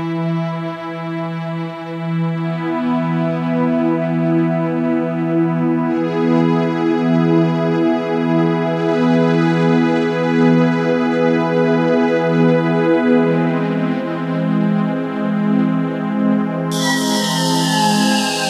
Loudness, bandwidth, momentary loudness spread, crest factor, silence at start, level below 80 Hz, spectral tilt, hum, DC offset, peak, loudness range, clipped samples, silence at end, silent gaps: -17 LUFS; 14 kHz; 7 LU; 14 dB; 0 s; -72 dBFS; -6 dB/octave; none; under 0.1%; -2 dBFS; 4 LU; under 0.1%; 0 s; none